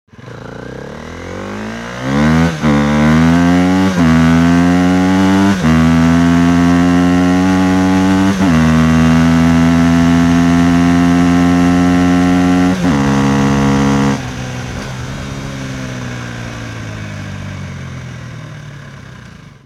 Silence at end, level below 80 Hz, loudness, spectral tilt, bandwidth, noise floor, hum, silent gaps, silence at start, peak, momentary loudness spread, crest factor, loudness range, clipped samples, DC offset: 0.35 s; -30 dBFS; -11 LUFS; -6.5 dB/octave; 13 kHz; -35 dBFS; none; none; 0.2 s; -2 dBFS; 17 LU; 10 dB; 14 LU; under 0.1%; under 0.1%